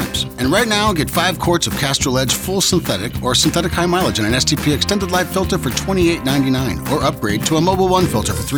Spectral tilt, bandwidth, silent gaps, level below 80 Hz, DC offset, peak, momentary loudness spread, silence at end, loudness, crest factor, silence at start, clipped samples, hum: -4 dB/octave; over 20 kHz; none; -32 dBFS; under 0.1%; -2 dBFS; 4 LU; 0 s; -16 LUFS; 14 dB; 0 s; under 0.1%; none